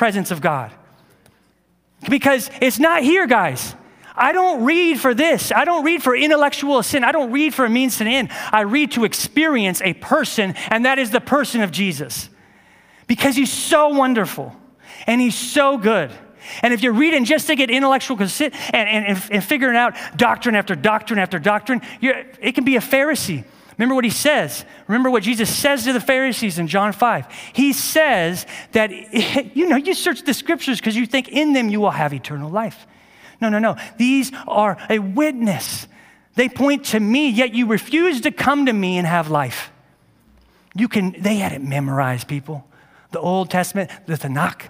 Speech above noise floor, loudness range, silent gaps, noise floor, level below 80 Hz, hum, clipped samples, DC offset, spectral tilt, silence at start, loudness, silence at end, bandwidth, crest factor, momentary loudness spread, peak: 42 dB; 4 LU; none; -60 dBFS; -58 dBFS; none; under 0.1%; under 0.1%; -4 dB/octave; 0 s; -18 LUFS; 0 s; 16 kHz; 18 dB; 10 LU; 0 dBFS